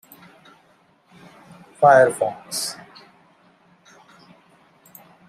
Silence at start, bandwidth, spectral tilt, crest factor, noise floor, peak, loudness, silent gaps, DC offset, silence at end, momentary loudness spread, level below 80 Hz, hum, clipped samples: 1.8 s; 15.5 kHz; -3.5 dB/octave; 22 dB; -58 dBFS; -2 dBFS; -18 LUFS; none; under 0.1%; 2.55 s; 15 LU; -72 dBFS; none; under 0.1%